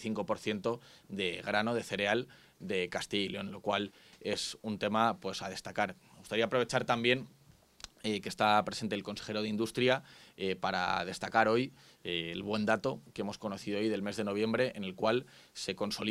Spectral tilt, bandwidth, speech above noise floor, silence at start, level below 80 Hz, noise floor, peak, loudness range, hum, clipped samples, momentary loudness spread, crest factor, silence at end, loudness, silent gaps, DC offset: -4.5 dB/octave; 15.5 kHz; 20 dB; 0 s; -68 dBFS; -54 dBFS; -12 dBFS; 2 LU; none; under 0.1%; 11 LU; 22 dB; 0 s; -34 LUFS; none; under 0.1%